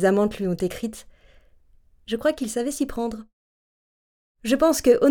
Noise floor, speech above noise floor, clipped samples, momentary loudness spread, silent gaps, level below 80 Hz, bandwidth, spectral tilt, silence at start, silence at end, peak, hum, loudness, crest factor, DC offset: -56 dBFS; 34 dB; under 0.1%; 15 LU; 3.33-4.35 s; -50 dBFS; 20 kHz; -5 dB/octave; 0 s; 0 s; -6 dBFS; none; -24 LUFS; 18 dB; under 0.1%